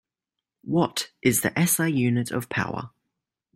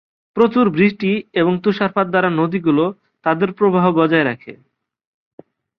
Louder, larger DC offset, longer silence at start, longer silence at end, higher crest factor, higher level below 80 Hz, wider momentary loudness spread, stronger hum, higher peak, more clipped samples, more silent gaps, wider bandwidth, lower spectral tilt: second, -24 LUFS vs -17 LUFS; neither; first, 0.65 s vs 0.35 s; second, 0.65 s vs 1.25 s; about the same, 18 dB vs 16 dB; about the same, -60 dBFS vs -58 dBFS; first, 12 LU vs 7 LU; neither; second, -8 dBFS vs 0 dBFS; neither; neither; first, 16.5 kHz vs 5.8 kHz; second, -4.5 dB/octave vs -9 dB/octave